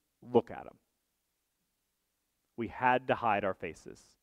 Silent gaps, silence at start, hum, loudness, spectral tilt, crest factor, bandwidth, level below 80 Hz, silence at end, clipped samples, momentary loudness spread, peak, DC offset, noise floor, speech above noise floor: none; 0.25 s; none; -32 LUFS; -6.5 dB/octave; 24 dB; 11 kHz; -68 dBFS; 0.3 s; under 0.1%; 22 LU; -10 dBFS; under 0.1%; -82 dBFS; 49 dB